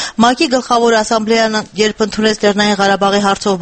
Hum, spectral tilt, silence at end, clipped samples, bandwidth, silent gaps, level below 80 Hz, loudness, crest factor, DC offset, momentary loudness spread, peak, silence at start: none; -3.5 dB/octave; 0 s; under 0.1%; 8.8 kHz; none; -46 dBFS; -13 LUFS; 12 dB; under 0.1%; 3 LU; 0 dBFS; 0 s